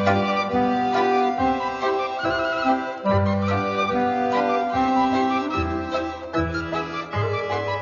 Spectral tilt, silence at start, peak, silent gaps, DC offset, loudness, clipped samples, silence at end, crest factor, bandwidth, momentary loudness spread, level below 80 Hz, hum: -6.5 dB/octave; 0 s; -8 dBFS; none; under 0.1%; -23 LUFS; under 0.1%; 0 s; 16 dB; 7.4 kHz; 6 LU; -46 dBFS; none